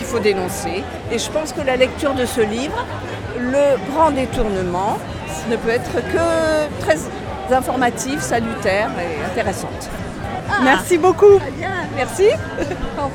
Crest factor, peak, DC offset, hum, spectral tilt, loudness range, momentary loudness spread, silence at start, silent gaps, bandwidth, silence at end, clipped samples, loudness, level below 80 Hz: 18 dB; 0 dBFS; under 0.1%; none; -5 dB/octave; 4 LU; 11 LU; 0 s; none; 19 kHz; 0 s; under 0.1%; -18 LUFS; -36 dBFS